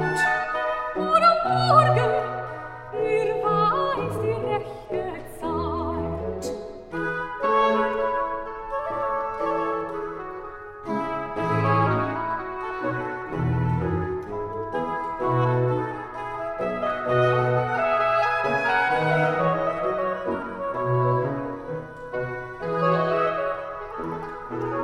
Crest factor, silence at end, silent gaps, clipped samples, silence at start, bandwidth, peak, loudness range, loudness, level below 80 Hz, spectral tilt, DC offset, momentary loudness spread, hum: 20 dB; 0 s; none; under 0.1%; 0 s; 13.5 kHz; -4 dBFS; 6 LU; -25 LUFS; -48 dBFS; -7 dB/octave; under 0.1%; 11 LU; none